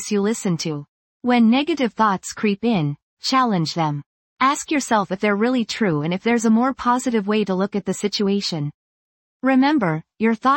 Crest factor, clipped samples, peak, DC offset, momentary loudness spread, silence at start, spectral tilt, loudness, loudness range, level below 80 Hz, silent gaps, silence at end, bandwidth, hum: 14 dB; under 0.1%; -6 dBFS; under 0.1%; 8 LU; 0 s; -5 dB/octave; -20 LUFS; 2 LU; -60 dBFS; 0.89-1.20 s, 3.02-3.17 s, 4.06-4.36 s, 8.74-9.40 s; 0 s; 16.5 kHz; none